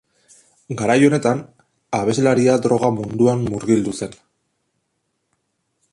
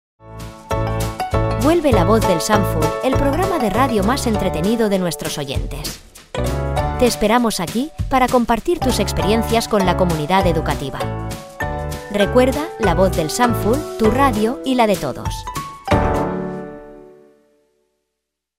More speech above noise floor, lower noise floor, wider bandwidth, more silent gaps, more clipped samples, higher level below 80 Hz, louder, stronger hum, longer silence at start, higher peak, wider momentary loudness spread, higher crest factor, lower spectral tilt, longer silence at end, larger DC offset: second, 55 dB vs 62 dB; second, -72 dBFS vs -79 dBFS; second, 11.5 kHz vs 16 kHz; neither; neither; second, -54 dBFS vs -30 dBFS; about the same, -18 LUFS vs -18 LUFS; neither; first, 0.7 s vs 0.25 s; about the same, -2 dBFS vs 0 dBFS; about the same, 11 LU vs 11 LU; about the same, 18 dB vs 18 dB; about the same, -6 dB/octave vs -5.5 dB/octave; first, 1.8 s vs 1.5 s; neither